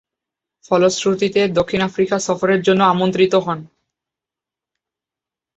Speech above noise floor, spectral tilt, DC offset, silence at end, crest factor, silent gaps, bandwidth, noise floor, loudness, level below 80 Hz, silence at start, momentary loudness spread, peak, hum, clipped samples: 71 dB; -5 dB/octave; under 0.1%; 1.9 s; 16 dB; none; 8.2 kHz; -87 dBFS; -17 LUFS; -54 dBFS; 0.7 s; 5 LU; -2 dBFS; none; under 0.1%